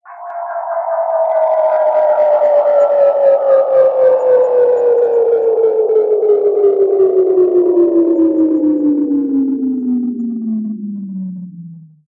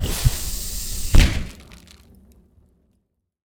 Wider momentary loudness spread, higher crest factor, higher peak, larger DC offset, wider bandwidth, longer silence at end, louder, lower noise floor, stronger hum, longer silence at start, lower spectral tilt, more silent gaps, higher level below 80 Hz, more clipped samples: second, 12 LU vs 21 LU; second, 10 dB vs 20 dB; about the same, -2 dBFS vs -2 dBFS; neither; second, 4 kHz vs over 20 kHz; second, 0.35 s vs 1.75 s; first, -13 LUFS vs -22 LUFS; second, -34 dBFS vs -70 dBFS; neither; about the same, 0.05 s vs 0 s; first, -10 dB/octave vs -4 dB/octave; neither; second, -66 dBFS vs -24 dBFS; neither